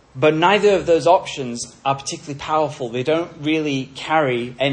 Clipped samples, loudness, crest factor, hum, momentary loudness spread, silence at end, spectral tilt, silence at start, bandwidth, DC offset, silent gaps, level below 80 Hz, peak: under 0.1%; -19 LUFS; 18 dB; none; 11 LU; 0 s; -4.5 dB/octave; 0.15 s; 10.5 kHz; under 0.1%; none; -54 dBFS; -2 dBFS